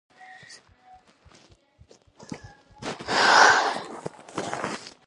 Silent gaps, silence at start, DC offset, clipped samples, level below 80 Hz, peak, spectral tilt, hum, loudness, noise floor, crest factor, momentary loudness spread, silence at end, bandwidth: none; 0.3 s; under 0.1%; under 0.1%; -62 dBFS; -4 dBFS; -1.5 dB/octave; none; -21 LUFS; -57 dBFS; 24 dB; 26 LU; 0.15 s; 11.5 kHz